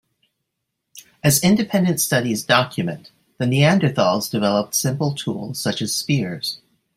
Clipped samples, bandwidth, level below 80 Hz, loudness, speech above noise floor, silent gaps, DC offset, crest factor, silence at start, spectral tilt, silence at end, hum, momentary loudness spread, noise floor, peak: under 0.1%; 16 kHz; -58 dBFS; -19 LUFS; 59 dB; none; under 0.1%; 18 dB; 0.95 s; -4.5 dB/octave; 0.4 s; none; 10 LU; -78 dBFS; -2 dBFS